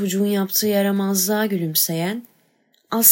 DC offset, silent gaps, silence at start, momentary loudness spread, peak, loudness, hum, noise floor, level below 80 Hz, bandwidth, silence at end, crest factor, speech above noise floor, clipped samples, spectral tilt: under 0.1%; none; 0 s; 8 LU; 0 dBFS; -19 LUFS; none; -62 dBFS; -78 dBFS; 16.5 kHz; 0 s; 20 dB; 42 dB; under 0.1%; -3.5 dB/octave